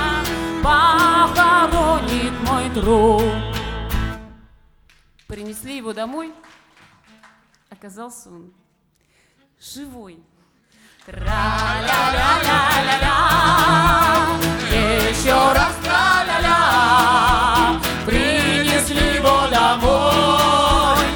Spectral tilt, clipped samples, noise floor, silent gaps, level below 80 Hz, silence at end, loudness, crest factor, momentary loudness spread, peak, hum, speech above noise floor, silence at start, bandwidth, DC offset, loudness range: -4 dB/octave; under 0.1%; -63 dBFS; none; -30 dBFS; 0 s; -16 LUFS; 16 dB; 17 LU; -2 dBFS; none; 45 dB; 0 s; over 20 kHz; under 0.1%; 18 LU